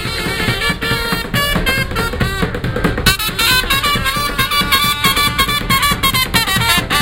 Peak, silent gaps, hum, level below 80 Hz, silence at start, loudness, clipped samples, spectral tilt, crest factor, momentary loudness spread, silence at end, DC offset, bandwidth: 0 dBFS; none; none; -26 dBFS; 0 s; -14 LUFS; under 0.1%; -3 dB/octave; 16 dB; 6 LU; 0 s; under 0.1%; 17 kHz